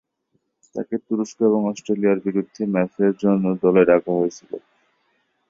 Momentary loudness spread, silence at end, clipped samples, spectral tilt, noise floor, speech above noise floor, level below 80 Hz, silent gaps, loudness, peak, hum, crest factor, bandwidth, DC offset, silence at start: 15 LU; 0.9 s; under 0.1%; -7.5 dB/octave; -71 dBFS; 51 dB; -64 dBFS; none; -20 LUFS; -2 dBFS; none; 18 dB; 7.6 kHz; under 0.1%; 0.75 s